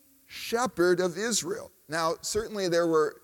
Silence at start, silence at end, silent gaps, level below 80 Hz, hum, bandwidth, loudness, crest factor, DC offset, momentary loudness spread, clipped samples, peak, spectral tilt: 0.3 s; 0.05 s; none; -60 dBFS; none; 18 kHz; -28 LUFS; 16 dB; under 0.1%; 12 LU; under 0.1%; -12 dBFS; -3.5 dB/octave